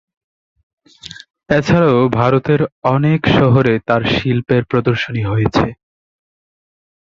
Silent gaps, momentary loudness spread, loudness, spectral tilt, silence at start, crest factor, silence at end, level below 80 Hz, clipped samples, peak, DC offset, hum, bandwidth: 1.30-1.34 s, 2.72-2.82 s; 6 LU; -14 LUFS; -7.5 dB/octave; 1.05 s; 16 dB; 1.4 s; -40 dBFS; under 0.1%; 0 dBFS; under 0.1%; none; 7.4 kHz